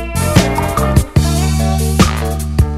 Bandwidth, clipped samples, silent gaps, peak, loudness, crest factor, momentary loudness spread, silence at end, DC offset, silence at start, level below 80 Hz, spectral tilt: 16 kHz; 0.2%; none; 0 dBFS; -14 LUFS; 12 dB; 3 LU; 0 s; under 0.1%; 0 s; -18 dBFS; -5.5 dB/octave